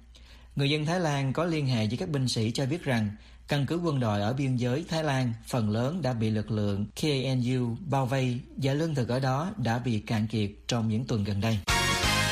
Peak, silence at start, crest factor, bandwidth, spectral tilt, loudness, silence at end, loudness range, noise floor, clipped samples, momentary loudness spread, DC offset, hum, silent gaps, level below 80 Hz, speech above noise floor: -12 dBFS; 0.1 s; 16 dB; 15.5 kHz; -5.5 dB/octave; -28 LUFS; 0 s; 1 LU; -51 dBFS; under 0.1%; 4 LU; under 0.1%; none; none; -48 dBFS; 23 dB